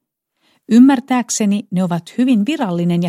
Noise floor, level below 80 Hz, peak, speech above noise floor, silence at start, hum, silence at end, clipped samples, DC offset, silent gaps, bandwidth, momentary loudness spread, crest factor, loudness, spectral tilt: -64 dBFS; -64 dBFS; 0 dBFS; 50 dB; 0.7 s; none; 0 s; under 0.1%; under 0.1%; none; 14.5 kHz; 9 LU; 14 dB; -15 LUFS; -5.5 dB/octave